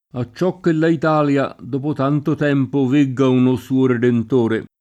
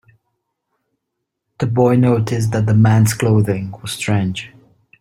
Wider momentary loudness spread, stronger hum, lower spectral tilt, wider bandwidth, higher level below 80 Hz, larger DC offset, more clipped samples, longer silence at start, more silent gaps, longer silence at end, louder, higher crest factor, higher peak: second, 6 LU vs 11 LU; neither; first, -8 dB/octave vs -6.5 dB/octave; second, 9 kHz vs 16 kHz; second, -58 dBFS vs -50 dBFS; neither; neither; second, 0.15 s vs 1.6 s; neither; second, 0.15 s vs 0.55 s; about the same, -17 LUFS vs -16 LUFS; about the same, 12 dB vs 16 dB; about the same, -4 dBFS vs -2 dBFS